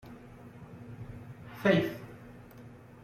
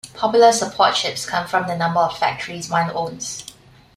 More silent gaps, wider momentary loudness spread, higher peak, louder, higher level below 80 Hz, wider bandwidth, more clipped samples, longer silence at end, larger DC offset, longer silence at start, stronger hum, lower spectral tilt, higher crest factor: neither; first, 24 LU vs 14 LU; second, -12 dBFS vs -2 dBFS; second, -29 LUFS vs -19 LUFS; about the same, -62 dBFS vs -58 dBFS; about the same, 15.5 kHz vs 15 kHz; neither; second, 0.1 s vs 0.45 s; neither; about the same, 0.05 s vs 0.05 s; neither; first, -7 dB/octave vs -3 dB/octave; first, 24 dB vs 18 dB